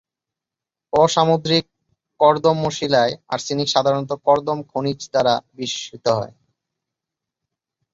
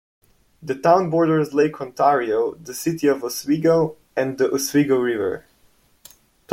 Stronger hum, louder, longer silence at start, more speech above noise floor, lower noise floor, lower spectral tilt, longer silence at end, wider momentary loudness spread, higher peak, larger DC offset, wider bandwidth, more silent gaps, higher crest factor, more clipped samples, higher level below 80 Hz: neither; about the same, -19 LUFS vs -20 LUFS; first, 0.95 s vs 0.6 s; first, 69 dB vs 39 dB; first, -87 dBFS vs -58 dBFS; about the same, -4.5 dB/octave vs -5.5 dB/octave; first, 1.65 s vs 0 s; about the same, 9 LU vs 9 LU; about the same, -2 dBFS vs -2 dBFS; neither; second, 8 kHz vs 16.5 kHz; neither; about the same, 20 dB vs 18 dB; neither; about the same, -58 dBFS vs -62 dBFS